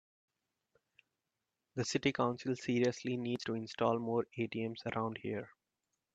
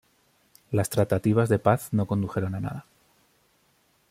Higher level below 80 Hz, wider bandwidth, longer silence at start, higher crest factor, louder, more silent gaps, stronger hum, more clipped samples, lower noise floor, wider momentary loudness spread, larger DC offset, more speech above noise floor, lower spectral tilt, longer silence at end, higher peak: second, -76 dBFS vs -58 dBFS; second, 8.8 kHz vs 16 kHz; first, 1.75 s vs 0.7 s; about the same, 20 dB vs 22 dB; second, -37 LUFS vs -26 LUFS; neither; neither; neither; first, -89 dBFS vs -66 dBFS; about the same, 8 LU vs 10 LU; neither; first, 53 dB vs 42 dB; second, -5.5 dB/octave vs -7 dB/octave; second, 0.65 s vs 1.3 s; second, -18 dBFS vs -6 dBFS